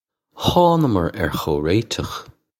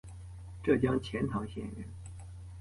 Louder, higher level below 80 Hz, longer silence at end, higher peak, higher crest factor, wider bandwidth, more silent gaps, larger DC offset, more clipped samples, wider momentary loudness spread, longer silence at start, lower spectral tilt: first, -19 LUFS vs -33 LUFS; first, -40 dBFS vs -50 dBFS; first, 0.35 s vs 0 s; first, -2 dBFS vs -14 dBFS; about the same, 18 dB vs 20 dB; first, 16.5 kHz vs 11.5 kHz; neither; neither; neither; second, 11 LU vs 19 LU; first, 0.35 s vs 0.05 s; second, -6 dB/octave vs -7.5 dB/octave